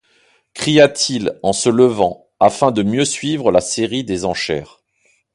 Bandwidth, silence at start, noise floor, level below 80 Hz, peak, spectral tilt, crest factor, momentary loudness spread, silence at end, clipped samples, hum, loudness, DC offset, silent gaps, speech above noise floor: 11.5 kHz; 0.55 s; -61 dBFS; -48 dBFS; 0 dBFS; -4 dB/octave; 16 dB; 9 LU; 0.7 s; under 0.1%; none; -16 LUFS; under 0.1%; none; 45 dB